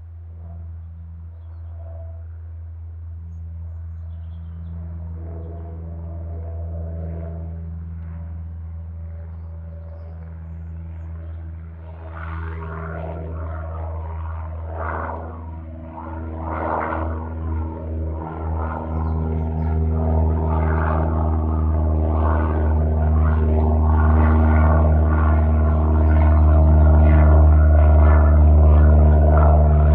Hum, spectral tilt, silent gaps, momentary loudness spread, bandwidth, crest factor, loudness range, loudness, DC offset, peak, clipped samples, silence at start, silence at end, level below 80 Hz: none; -13 dB/octave; none; 22 LU; 2.7 kHz; 14 dB; 20 LU; -19 LUFS; under 0.1%; -4 dBFS; under 0.1%; 0 s; 0 s; -20 dBFS